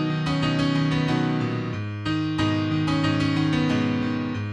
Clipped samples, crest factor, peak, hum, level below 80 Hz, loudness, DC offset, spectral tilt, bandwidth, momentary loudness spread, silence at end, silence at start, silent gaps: under 0.1%; 14 dB; -10 dBFS; none; -48 dBFS; -24 LUFS; under 0.1%; -6.5 dB/octave; 10 kHz; 5 LU; 0 s; 0 s; none